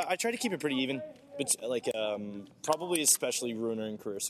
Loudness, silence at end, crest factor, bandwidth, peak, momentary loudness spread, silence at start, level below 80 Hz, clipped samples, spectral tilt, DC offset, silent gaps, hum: -31 LUFS; 0 s; 20 dB; 13.5 kHz; -12 dBFS; 13 LU; 0 s; -78 dBFS; under 0.1%; -2 dB/octave; under 0.1%; none; none